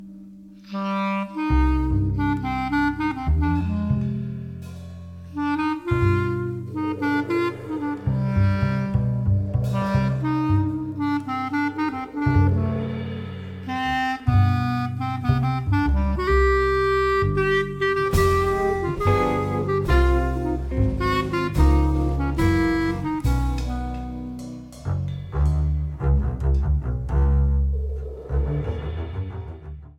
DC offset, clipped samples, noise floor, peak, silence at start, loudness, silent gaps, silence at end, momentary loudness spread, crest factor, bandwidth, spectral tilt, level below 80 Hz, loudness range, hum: under 0.1%; under 0.1%; -43 dBFS; -6 dBFS; 0 s; -23 LUFS; none; 0.05 s; 11 LU; 16 dB; 15 kHz; -8 dB/octave; -28 dBFS; 4 LU; none